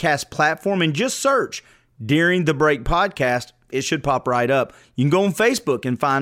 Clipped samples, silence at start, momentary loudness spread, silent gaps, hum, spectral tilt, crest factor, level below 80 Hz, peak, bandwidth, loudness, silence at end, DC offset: under 0.1%; 0 s; 8 LU; none; none; -5 dB/octave; 16 dB; -40 dBFS; -4 dBFS; 16 kHz; -20 LUFS; 0 s; under 0.1%